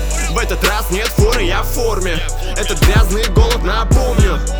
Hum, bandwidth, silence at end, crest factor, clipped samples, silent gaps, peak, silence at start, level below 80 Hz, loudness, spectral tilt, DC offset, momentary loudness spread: none; over 20 kHz; 0 s; 14 dB; under 0.1%; none; 0 dBFS; 0 s; -16 dBFS; -15 LUFS; -4.5 dB/octave; under 0.1%; 6 LU